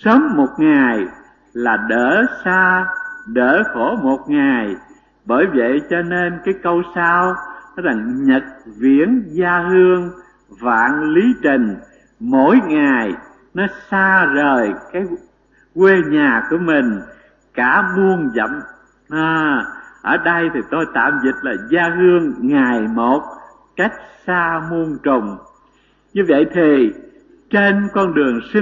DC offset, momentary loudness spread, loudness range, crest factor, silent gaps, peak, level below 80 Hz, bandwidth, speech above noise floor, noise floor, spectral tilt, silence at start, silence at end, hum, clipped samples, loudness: under 0.1%; 13 LU; 3 LU; 16 dB; none; 0 dBFS; -52 dBFS; 7.4 kHz; 40 dB; -55 dBFS; -7.5 dB/octave; 0.05 s; 0 s; none; under 0.1%; -16 LUFS